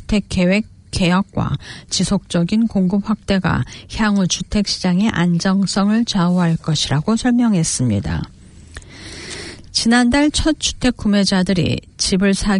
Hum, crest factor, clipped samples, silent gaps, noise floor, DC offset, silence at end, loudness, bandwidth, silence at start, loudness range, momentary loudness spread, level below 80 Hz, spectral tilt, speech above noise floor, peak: none; 14 dB; under 0.1%; none; -38 dBFS; under 0.1%; 0 s; -17 LUFS; 11 kHz; 0 s; 2 LU; 11 LU; -36 dBFS; -5 dB/octave; 21 dB; -4 dBFS